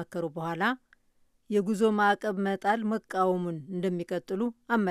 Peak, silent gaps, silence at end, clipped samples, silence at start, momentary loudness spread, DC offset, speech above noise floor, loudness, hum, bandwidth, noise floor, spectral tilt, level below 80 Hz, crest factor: -12 dBFS; none; 0 s; under 0.1%; 0 s; 8 LU; under 0.1%; 39 dB; -29 LUFS; none; 14 kHz; -67 dBFS; -6.5 dB/octave; -72 dBFS; 16 dB